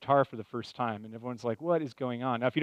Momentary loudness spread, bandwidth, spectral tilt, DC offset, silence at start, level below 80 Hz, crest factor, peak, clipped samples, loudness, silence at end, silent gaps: 12 LU; 9.4 kHz; -7.5 dB/octave; under 0.1%; 0 s; -76 dBFS; 20 dB; -12 dBFS; under 0.1%; -33 LUFS; 0 s; none